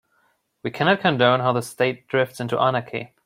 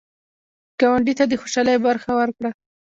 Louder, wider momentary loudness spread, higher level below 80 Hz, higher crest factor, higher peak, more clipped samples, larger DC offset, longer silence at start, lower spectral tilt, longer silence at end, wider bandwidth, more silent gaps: about the same, -21 LUFS vs -20 LUFS; about the same, 12 LU vs 11 LU; second, -64 dBFS vs -56 dBFS; about the same, 20 dB vs 16 dB; about the same, -4 dBFS vs -4 dBFS; neither; neither; second, 0.65 s vs 0.8 s; first, -5.5 dB/octave vs -4 dB/octave; second, 0.2 s vs 0.45 s; first, 16 kHz vs 7.8 kHz; neither